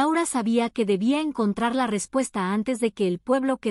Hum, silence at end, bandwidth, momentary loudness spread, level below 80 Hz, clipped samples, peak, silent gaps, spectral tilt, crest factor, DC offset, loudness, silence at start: none; 0 s; 13.5 kHz; 3 LU; -62 dBFS; under 0.1%; -10 dBFS; none; -5 dB/octave; 14 dB; under 0.1%; -24 LUFS; 0 s